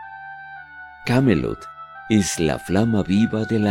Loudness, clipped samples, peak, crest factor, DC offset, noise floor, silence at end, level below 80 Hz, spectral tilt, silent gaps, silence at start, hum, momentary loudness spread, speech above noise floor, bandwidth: -20 LUFS; under 0.1%; -4 dBFS; 18 dB; under 0.1%; -40 dBFS; 0 s; -46 dBFS; -6 dB/octave; none; 0 s; none; 19 LU; 21 dB; 16.5 kHz